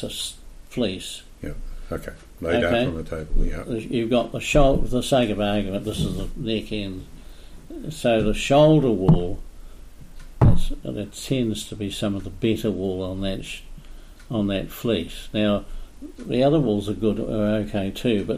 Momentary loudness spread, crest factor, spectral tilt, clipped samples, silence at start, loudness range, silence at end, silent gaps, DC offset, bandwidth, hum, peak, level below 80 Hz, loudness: 16 LU; 18 dB; -6 dB/octave; under 0.1%; 0 s; 6 LU; 0 s; none; under 0.1%; 15 kHz; none; -4 dBFS; -30 dBFS; -23 LUFS